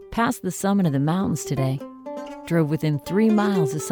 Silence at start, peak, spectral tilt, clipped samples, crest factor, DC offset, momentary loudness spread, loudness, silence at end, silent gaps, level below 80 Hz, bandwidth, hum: 0 s; -8 dBFS; -6.5 dB/octave; under 0.1%; 14 dB; under 0.1%; 14 LU; -22 LUFS; 0 s; none; -52 dBFS; over 20 kHz; none